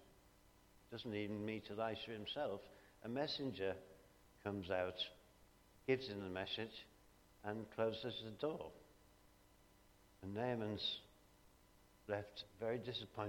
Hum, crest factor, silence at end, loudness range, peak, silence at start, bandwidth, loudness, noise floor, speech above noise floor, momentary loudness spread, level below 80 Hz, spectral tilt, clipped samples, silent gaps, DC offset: none; 24 dB; 0 s; 3 LU; -24 dBFS; 0 s; 19 kHz; -45 LUFS; -70 dBFS; 25 dB; 13 LU; -74 dBFS; -6 dB/octave; under 0.1%; none; under 0.1%